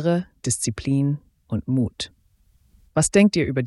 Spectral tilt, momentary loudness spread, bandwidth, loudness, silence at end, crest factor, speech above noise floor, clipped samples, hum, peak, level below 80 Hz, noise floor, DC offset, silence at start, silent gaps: -5 dB/octave; 14 LU; 12 kHz; -22 LUFS; 0 s; 18 dB; 39 dB; under 0.1%; none; -4 dBFS; -48 dBFS; -60 dBFS; under 0.1%; 0 s; none